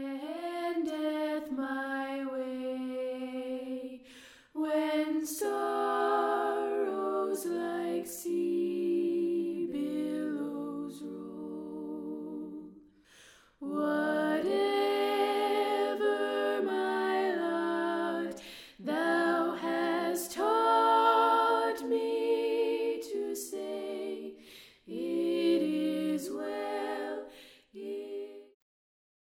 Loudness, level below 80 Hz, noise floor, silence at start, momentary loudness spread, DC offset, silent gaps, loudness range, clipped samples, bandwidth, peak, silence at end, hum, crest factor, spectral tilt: -32 LUFS; -76 dBFS; -59 dBFS; 0 s; 13 LU; under 0.1%; none; 9 LU; under 0.1%; 16.5 kHz; -14 dBFS; 0.85 s; none; 18 dB; -4 dB/octave